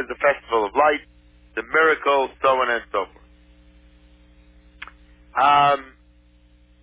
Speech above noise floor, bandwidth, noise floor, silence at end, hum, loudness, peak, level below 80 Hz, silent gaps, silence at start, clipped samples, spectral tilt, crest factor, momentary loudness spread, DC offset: 34 dB; 4 kHz; -54 dBFS; 1 s; 60 Hz at -55 dBFS; -20 LUFS; -6 dBFS; -52 dBFS; none; 0 s; under 0.1%; -7 dB/octave; 18 dB; 18 LU; under 0.1%